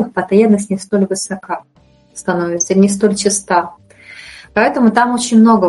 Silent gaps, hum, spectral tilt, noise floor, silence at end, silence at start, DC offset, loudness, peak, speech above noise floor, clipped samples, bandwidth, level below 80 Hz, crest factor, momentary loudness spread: none; none; -5 dB/octave; -37 dBFS; 0 s; 0 s; under 0.1%; -14 LUFS; 0 dBFS; 24 dB; under 0.1%; 11.5 kHz; -54 dBFS; 14 dB; 15 LU